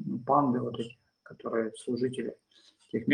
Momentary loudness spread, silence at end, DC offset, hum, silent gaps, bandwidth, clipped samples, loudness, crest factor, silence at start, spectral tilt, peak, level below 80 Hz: 14 LU; 0 s; under 0.1%; none; none; 10.5 kHz; under 0.1%; -31 LUFS; 20 dB; 0 s; -7 dB/octave; -12 dBFS; -76 dBFS